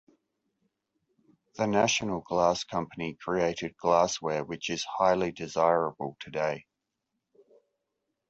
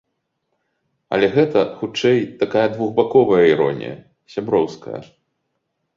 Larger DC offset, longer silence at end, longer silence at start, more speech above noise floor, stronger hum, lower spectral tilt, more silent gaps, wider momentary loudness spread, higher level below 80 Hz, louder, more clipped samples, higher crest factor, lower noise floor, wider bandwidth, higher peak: neither; first, 1.7 s vs 0.95 s; first, 1.55 s vs 1.1 s; about the same, 55 dB vs 56 dB; neither; second, -4 dB/octave vs -6.5 dB/octave; neither; second, 10 LU vs 17 LU; about the same, -62 dBFS vs -58 dBFS; second, -29 LUFS vs -18 LUFS; neither; about the same, 22 dB vs 18 dB; first, -84 dBFS vs -73 dBFS; first, 8.2 kHz vs 7.4 kHz; second, -10 dBFS vs -2 dBFS